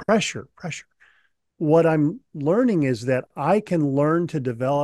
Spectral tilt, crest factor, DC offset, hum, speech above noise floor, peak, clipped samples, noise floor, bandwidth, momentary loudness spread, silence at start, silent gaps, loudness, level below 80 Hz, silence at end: -6.5 dB/octave; 16 dB; under 0.1%; none; 43 dB; -6 dBFS; under 0.1%; -64 dBFS; 12 kHz; 15 LU; 0 s; none; -22 LUFS; -62 dBFS; 0 s